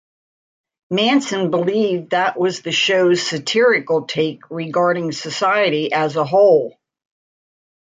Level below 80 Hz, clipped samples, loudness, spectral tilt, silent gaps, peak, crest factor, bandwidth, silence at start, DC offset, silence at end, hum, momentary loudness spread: -68 dBFS; under 0.1%; -17 LUFS; -4.5 dB/octave; none; -4 dBFS; 14 dB; 9.4 kHz; 0.9 s; under 0.1%; 1.15 s; none; 8 LU